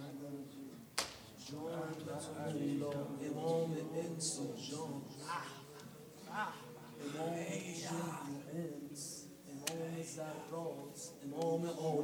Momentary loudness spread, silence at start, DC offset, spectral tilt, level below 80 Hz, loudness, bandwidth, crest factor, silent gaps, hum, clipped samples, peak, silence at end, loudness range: 12 LU; 0 s; under 0.1%; -4.5 dB/octave; -80 dBFS; -43 LUFS; over 20 kHz; 24 dB; none; none; under 0.1%; -18 dBFS; 0 s; 4 LU